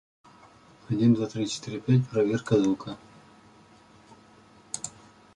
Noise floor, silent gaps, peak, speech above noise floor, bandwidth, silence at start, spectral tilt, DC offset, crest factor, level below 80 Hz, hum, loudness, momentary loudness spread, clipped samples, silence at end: -55 dBFS; none; -8 dBFS; 30 dB; 11 kHz; 0.9 s; -6.5 dB/octave; under 0.1%; 20 dB; -62 dBFS; none; -26 LUFS; 15 LU; under 0.1%; 0.45 s